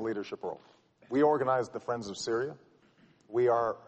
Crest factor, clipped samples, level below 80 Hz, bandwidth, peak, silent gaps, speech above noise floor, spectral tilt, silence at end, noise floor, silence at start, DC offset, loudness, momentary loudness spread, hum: 18 dB; under 0.1%; -72 dBFS; 8.4 kHz; -14 dBFS; none; 33 dB; -5.5 dB/octave; 0.1 s; -63 dBFS; 0 s; under 0.1%; -31 LUFS; 13 LU; none